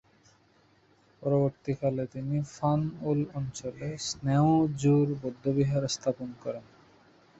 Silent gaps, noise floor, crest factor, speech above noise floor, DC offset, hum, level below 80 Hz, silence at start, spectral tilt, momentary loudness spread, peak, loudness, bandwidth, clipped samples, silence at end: none; -64 dBFS; 16 dB; 36 dB; under 0.1%; none; -60 dBFS; 1.2 s; -6.5 dB/octave; 12 LU; -12 dBFS; -29 LUFS; 8 kHz; under 0.1%; 0.75 s